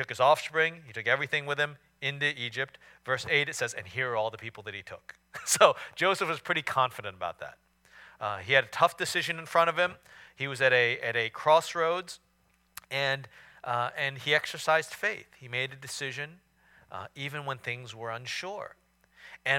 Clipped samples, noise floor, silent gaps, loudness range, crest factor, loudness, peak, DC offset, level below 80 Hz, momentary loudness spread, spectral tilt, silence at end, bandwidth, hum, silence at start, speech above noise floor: under 0.1%; -69 dBFS; none; 9 LU; 26 dB; -29 LUFS; -4 dBFS; under 0.1%; -72 dBFS; 17 LU; -2.5 dB/octave; 0 s; 17.5 kHz; none; 0 s; 39 dB